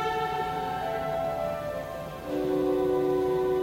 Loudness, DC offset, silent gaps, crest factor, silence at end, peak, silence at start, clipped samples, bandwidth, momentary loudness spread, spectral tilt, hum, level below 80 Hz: -29 LUFS; under 0.1%; none; 12 dB; 0 s; -16 dBFS; 0 s; under 0.1%; 16 kHz; 8 LU; -6.5 dB/octave; none; -52 dBFS